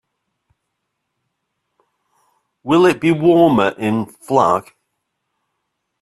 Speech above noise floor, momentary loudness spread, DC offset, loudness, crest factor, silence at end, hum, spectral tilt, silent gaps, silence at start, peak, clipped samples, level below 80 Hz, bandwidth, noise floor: 61 dB; 9 LU; under 0.1%; -15 LUFS; 18 dB; 1.4 s; none; -6.5 dB/octave; none; 2.65 s; 0 dBFS; under 0.1%; -58 dBFS; 12.5 kHz; -75 dBFS